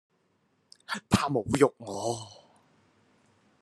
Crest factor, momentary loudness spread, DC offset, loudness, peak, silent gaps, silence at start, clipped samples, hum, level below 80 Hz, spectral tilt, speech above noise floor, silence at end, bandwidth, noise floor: 26 dB; 12 LU; under 0.1%; -29 LUFS; -6 dBFS; none; 0.9 s; under 0.1%; none; -58 dBFS; -5 dB/octave; 43 dB; 1.3 s; 13 kHz; -71 dBFS